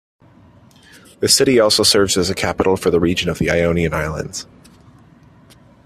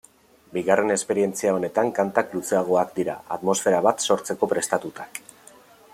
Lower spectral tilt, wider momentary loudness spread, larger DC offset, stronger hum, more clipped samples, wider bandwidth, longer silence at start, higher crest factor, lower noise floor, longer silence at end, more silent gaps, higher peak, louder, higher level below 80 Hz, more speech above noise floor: about the same, -3.5 dB/octave vs -4 dB/octave; first, 12 LU vs 8 LU; neither; neither; neither; about the same, 15 kHz vs 16 kHz; first, 1.2 s vs 0.5 s; about the same, 18 dB vs 20 dB; second, -47 dBFS vs -54 dBFS; first, 1.4 s vs 0.75 s; neither; first, 0 dBFS vs -4 dBFS; first, -15 LUFS vs -23 LUFS; first, -42 dBFS vs -68 dBFS; about the same, 31 dB vs 31 dB